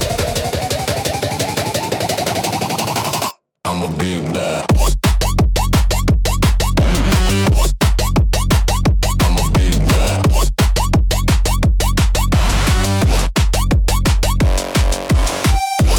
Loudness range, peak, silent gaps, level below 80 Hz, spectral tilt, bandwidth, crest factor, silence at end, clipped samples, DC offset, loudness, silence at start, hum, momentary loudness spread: 4 LU; -2 dBFS; none; -18 dBFS; -4.5 dB/octave; 18.5 kHz; 12 dB; 0 s; under 0.1%; under 0.1%; -16 LUFS; 0 s; none; 4 LU